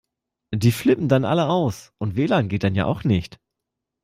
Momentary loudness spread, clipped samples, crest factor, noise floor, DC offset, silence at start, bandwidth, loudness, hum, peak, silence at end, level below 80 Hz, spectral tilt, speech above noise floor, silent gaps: 9 LU; under 0.1%; 18 dB; -83 dBFS; under 0.1%; 0.5 s; 16 kHz; -21 LUFS; none; -4 dBFS; 0.75 s; -50 dBFS; -7 dB/octave; 63 dB; none